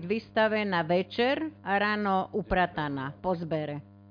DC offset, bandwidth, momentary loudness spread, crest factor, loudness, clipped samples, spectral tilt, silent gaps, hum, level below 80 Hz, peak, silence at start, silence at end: under 0.1%; 5.2 kHz; 7 LU; 16 dB; -29 LUFS; under 0.1%; -8 dB/octave; none; none; -52 dBFS; -14 dBFS; 0 s; 0.2 s